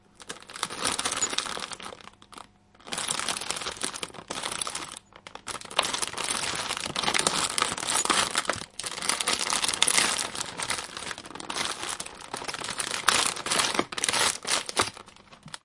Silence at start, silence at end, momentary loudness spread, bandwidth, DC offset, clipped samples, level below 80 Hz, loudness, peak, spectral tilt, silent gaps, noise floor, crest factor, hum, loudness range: 0.2 s; 0.05 s; 16 LU; 11.5 kHz; under 0.1%; under 0.1%; -60 dBFS; -27 LUFS; 0 dBFS; 0 dB/octave; none; -51 dBFS; 30 dB; none; 7 LU